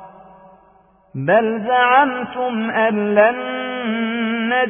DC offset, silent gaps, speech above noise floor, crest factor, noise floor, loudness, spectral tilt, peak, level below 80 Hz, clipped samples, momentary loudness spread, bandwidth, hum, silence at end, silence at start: under 0.1%; none; 36 dB; 16 dB; -53 dBFS; -17 LUFS; -9.5 dB/octave; -2 dBFS; -62 dBFS; under 0.1%; 10 LU; 3.6 kHz; none; 0 s; 0 s